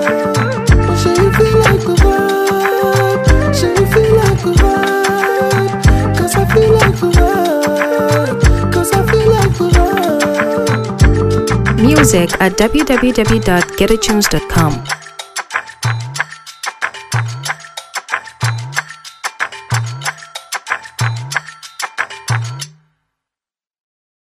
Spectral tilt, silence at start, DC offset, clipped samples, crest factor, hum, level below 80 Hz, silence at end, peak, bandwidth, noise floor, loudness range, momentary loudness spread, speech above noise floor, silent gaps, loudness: -5.5 dB/octave; 0 s; under 0.1%; under 0.1%; 12 dB; none; -22 dBFS; 1.7 s; 0 dBFS; 16 kHz; under -90 dBFS; 9 LU; 12 LU; over 78 dB; none; -13 LUFS